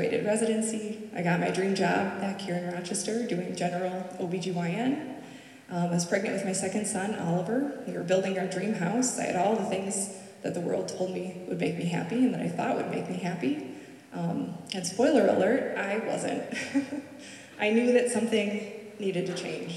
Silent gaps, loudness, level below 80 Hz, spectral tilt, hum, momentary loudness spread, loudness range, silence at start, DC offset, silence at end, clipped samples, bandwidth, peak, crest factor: none; -29 LUFS; -78 dBFS; -5 dB/octave; none; 10 LU; 3 LU; 0 s; under 0.1%; 0 s; under 0.1%; 13.5 kHz; -12 dBFS; 18 dB